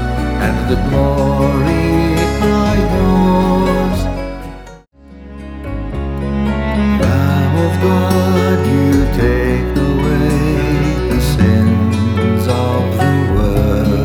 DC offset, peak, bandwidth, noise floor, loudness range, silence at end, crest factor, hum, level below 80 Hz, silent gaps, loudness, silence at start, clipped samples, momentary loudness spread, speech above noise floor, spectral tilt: under 0.1%; 0 dBFS; 17.5 kHz; -38 dBFS; 5 LU; 0 s; 12 dB; none; -22 dBFS; none; -14 LUFS; 0 s; under 0.1%; 9 LU; 25 dB; -7.5 dB/octave